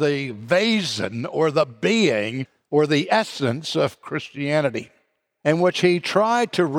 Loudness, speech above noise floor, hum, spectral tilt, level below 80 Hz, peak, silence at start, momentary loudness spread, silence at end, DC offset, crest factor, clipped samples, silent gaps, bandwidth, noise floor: -21 LUFS; 46 dB; none; -5 dB/octave; -68 dBFS; -6 dBFS; 0 s; 8 LU; 0 s; under 0.1%; 16 dB; under 0.1%; none; 16 kHz; -67 dBFS